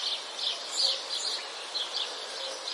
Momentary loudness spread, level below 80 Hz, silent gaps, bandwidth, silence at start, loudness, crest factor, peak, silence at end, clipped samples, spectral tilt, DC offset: 8 LU; under -90 dBFS; none; 11.5 kHz; 0 s; -30 LUFS; 18 dB; -14 dBFS; 0 s; under 0.1%; 2.5 dB/octave; under 0.1%